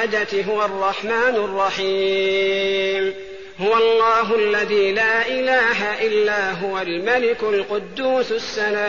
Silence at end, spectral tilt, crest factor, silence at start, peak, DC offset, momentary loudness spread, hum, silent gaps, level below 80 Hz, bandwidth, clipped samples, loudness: 0 s; -1 dB/octave; 12 dB; 0 s; -6 dBFS; 0.6%; 7 LU; none; none; -56 dBFS; 7.2 kHz; under 0.1%; -19 LUFS